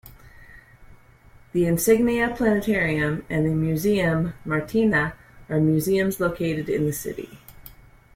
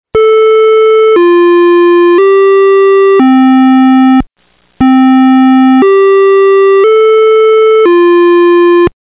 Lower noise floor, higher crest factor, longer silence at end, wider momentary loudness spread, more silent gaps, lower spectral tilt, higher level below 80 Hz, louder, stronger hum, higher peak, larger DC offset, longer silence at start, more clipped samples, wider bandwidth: about the same, -51 dBFS vs -52 dBFS; first, 18 dB vs 4 dB; first, 0.45 s vs 0.15 s; first, 9 LU vs 1 LU; neither; second, -6 dB/octave vs -9.5 dB/octave; second, -46 dBFS vs -40 dBFS; second, -23 LUFS vs -5 LUFS; neither; second, -6 dBFS vs 0 dBFS; second, under 0.1% vs 0.3%; about the same, 0.05 s vs 0.15 s; neither; first, 16.5 kHz vs 4 kHz